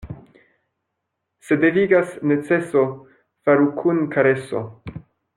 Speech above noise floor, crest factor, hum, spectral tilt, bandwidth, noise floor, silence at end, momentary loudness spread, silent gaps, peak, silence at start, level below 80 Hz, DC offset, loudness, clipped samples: 60 dB; 16 dB; none; -8 dB/octave; 11.5 kHz; -78 dBFS; 0.35 s; 20 LU; none; -4 dBFS; 0.05 s; -54 dBFS; under 0.1%; -19 LUFS; under 0.1%